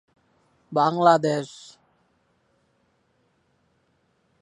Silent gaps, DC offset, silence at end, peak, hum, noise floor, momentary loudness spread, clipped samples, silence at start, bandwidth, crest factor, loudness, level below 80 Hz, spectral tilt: none; under 0.1%; 2.95 s; -4 dBFS; none; -68 dBFS; 20 LU; under 0.1%; 0.7 s; 11 kHz; 24 dB; -21 LUFS; -76 dBFS; -6 dB/octave